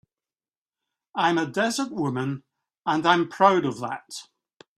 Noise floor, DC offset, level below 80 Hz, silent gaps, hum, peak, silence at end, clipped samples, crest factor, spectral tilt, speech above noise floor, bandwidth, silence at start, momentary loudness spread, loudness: under -90 dBFS; under 0.1%; -70 dBFS; none; none; -2 dBFS; 0.55 s; under 0.1%; 24 dB; -5 dB/octave; over 67 dB; 14 kHz; 1.15 s; 15 LU; -24 LUFS